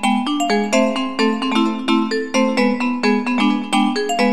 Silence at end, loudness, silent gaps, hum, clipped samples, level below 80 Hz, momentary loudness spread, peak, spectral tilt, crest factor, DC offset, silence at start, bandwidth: 0 s; -18 LUFS; none; none; under 0.1%; -64 dBFS; 2 LU; -4 dBFS; -4.5 dB/octave; 14 dB; 1%; 0 s; 13 kHz